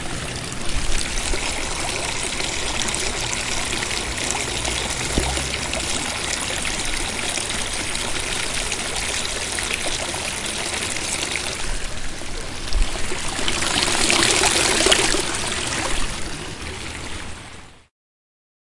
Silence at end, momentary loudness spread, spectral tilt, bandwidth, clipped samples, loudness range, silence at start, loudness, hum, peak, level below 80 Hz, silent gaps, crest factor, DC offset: 0.95 s; 14 LU; -1.5 dB/octave; 11.5 kHz; under 0.1%; 7 LU; 0 s; -22 LUFS; none; 0 dBFS; -32 dBFS; none; 22 dB; under 0.1%